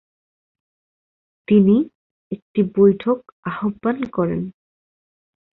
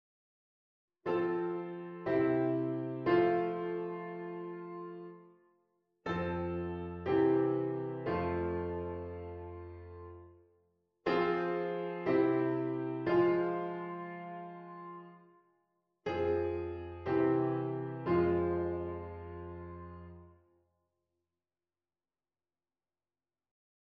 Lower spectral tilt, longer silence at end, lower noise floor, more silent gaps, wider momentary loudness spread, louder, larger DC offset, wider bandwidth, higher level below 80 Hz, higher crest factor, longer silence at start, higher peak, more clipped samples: first, -11.5 dB/octave vs -9.5 dB/octave; second, 1.05 s vs 3.55 s; about the same, under -90 dBFS vs under -90 dBFS; first, 1.95-2.31 s, 2.42-2.54 s, 3.32-3.43 s vs none; second, 15 LU vs 18 LU; first, -19 LUFS vs -34 LUFS; neither; second, 4.1 kHz vs 5.6 kHz; first, -56 dBFS vs -62 dBFS; about the same, 18 dB vs 20 dB; first, 1.5 s vs 1.05 s; first, -4 dBFS vs -16 dBFS; neither